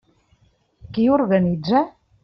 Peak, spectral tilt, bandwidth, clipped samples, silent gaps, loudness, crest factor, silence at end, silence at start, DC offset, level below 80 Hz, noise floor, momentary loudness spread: -4 dBFS; -6.5 dB/octave; 6 kHz; under 0.1%; none; -20 LUFS; 16 dB; 0.35 s; 0.9 s; under 0.1%; -52 dBFS; -60 dBFS; 11 LU